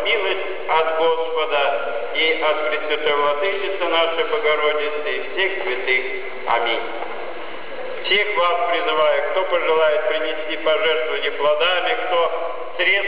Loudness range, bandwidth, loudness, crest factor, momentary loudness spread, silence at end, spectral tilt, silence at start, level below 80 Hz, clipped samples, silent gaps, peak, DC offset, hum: 3 LU; 5.2 kHz; -20 LUFS; 14 dB; 9 LU; 0 s; -7 dB/octave; 0 s; -68 dBFS; under 0.1%; none; -6 dBFS; 4%; none